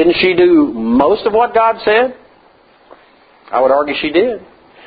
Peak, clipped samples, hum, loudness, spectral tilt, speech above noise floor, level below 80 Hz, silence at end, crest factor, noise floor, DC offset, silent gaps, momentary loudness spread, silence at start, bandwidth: 0 dBFS; under 0.1%; none; -13 LUFS; -8.5 dB/octave; 36 dB; -48 dBFS; 0.45 s; 14 dB; -48 dBFS; under 0.1%; none; 8 LU; 0 s; 5 kHz